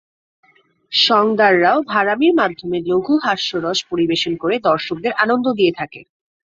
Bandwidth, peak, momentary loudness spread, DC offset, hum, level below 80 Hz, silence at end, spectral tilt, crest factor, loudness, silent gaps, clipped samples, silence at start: 7.6 kHz; 0 dBFS; 7 LU; under 0.1%; none; -58 dBFS; 0.5 s; -4.5 dB/octave; 18 dB; -16 LUFS; none; under 0.1%; 0.9 s